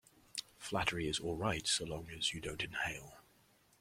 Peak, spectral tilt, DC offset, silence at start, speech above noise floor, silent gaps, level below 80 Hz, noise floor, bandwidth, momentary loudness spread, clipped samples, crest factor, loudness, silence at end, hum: -18 dBFS; -3 dB/octave; under 0.1%; 0.35 s; 31 dB; none; -60 dBFS; -70 dBFS; 16.5 kHz; 11 LU; under 0.1%; 22 dB; -38 LUFS; 0.6 s; none